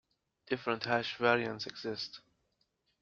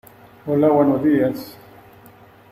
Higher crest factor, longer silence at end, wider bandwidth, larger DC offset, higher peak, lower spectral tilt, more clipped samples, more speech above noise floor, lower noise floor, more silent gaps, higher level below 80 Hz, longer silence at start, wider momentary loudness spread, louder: first, 24 dB vs 16 dB; second, 0.85 s vs 1 s; second, 7.4 kHz vs 15.5 kHz; neither; second, -14 dBFS vs -4 dBFS; second, -2.5 dB/octave vs -8.5 dB/octave; neither; first, 45 dB vs 30 dB; first, -79 dBFS vs -47 dBFS; neither; second, -74 dBFS vs -58 dBFS; about the same, 0.5 s vs 0.45 s; second, 11 LU vs 19 LU; second, -34 LUFS vs -18 LUFS